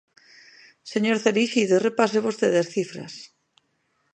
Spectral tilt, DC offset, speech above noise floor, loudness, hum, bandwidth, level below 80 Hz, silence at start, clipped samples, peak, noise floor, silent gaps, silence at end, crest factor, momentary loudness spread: -4.5 dB/octave; under 0.1%; 48 dB; -22 LUFS; none; 9.8 kHz; -76 dBFS; 0.85 s; under 0.1%; -4 dBFS; -71 dBFS; none; 0.9 s; 20 dB; 18 LU